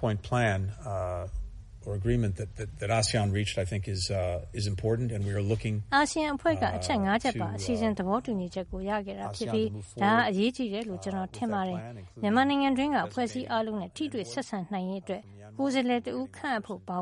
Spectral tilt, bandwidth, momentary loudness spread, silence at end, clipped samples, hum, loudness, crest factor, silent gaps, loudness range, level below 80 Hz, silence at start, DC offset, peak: -5.5 dB/octave; 11.5 kHz; 10 LU; 0 s; under 0.1%; none; -30 LUFS; 18 dB; none; 3 LU; -48 dBFS; 0 s; under 0.1%; -12 dBFS